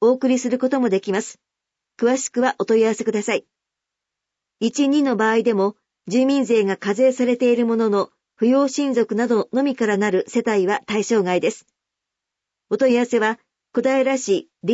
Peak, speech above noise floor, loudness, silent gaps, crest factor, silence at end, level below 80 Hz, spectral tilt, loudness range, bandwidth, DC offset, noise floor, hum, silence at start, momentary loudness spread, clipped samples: -6 dBFS; 65 dB; -20 LUFS; none; 14 dB; 0 s; -72 dBFS; -5 dB/octave; 3 LU; 8 kHz; under 0.1%; -84 dBFS; none; 0 s; 7 LU; under 0.1%